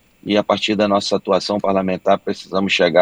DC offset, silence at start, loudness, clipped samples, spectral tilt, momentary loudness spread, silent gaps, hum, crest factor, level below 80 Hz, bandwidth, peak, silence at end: under 0.1%; 0.25 s; -18 LUFS; under 0.1%; -5 dB/octave; 4 LU; none; none; 16 dB; -56 dBFS; 10 kHz; 0 dBFS; 0 s